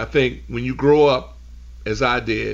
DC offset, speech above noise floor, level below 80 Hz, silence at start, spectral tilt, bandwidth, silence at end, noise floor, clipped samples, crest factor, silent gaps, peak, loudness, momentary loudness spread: under 0.1%; 20 dB; -38 dBFS; 0 s; -6 dB/octave; 7.6 kHz; 0 s; -39 dBFS; under 0.1%; 14 dB; none; -6 dBFS; -19 LUFS; 12 LU